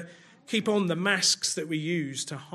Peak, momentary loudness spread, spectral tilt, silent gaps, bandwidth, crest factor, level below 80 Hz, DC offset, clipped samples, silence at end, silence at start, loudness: -10 dBFS; 10 LU; -3 dB/octave; none; 15.5 kHz; 20 dB; -76 dBFS; under 0.1%; under 0.1%; 0 s; 0 s; -27 LUFS